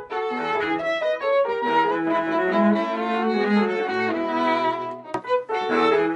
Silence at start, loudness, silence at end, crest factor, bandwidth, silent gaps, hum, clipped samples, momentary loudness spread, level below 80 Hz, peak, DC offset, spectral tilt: 0 s; -22 LUFS; 0 s; 14 dB; 9.8 kHz; none; none; under 0.1%; 5 LU; -64 dBFS; -8 dBFS; under 0.1%; -6.5 dB/octave